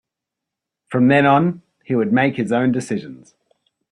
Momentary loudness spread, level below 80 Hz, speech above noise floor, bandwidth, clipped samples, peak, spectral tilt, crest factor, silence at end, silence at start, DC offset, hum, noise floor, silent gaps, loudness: 13 LU; -58 dBFS; 66 dB; 11 kHz; under 0.1%; -2 dBFS; -7 dB/octave; 18 dB; 0.75 s; 0.9 s; under 0.1%; none; -83 dBFS; none; -18 LUFS